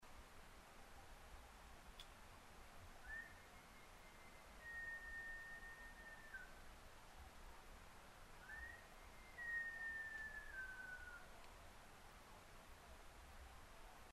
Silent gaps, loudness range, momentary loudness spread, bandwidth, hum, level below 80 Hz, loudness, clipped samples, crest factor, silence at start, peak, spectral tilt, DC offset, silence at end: none; 8 LU; 14 LU; 13 kHz; none; -64 dBFS; -56 LUFS; under 0.1%; 18 dB; 0 s; -38 dBFS; -3 dB/octave; under 0.1%; 0 s